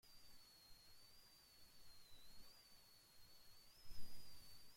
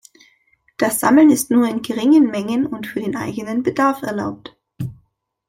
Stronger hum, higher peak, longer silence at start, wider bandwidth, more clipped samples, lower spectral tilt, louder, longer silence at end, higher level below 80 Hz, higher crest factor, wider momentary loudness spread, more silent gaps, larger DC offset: neither; second, -34 dBFS vs -2 dBFS; second, 0.05 s vs 0.8 s; about the same, 16.5 kHz vs 16.5 kHz; neither; second, -2 dB/octave vs -5 dB/octave; second, -66 LUFS vs -17 LUFS; second, 0 s vs 0.55 s; second, -70 dBFS vs -58 dBFS; about the same, 18 dB vs 16 dB; second, 4 LU vs 18 LU; neither; neither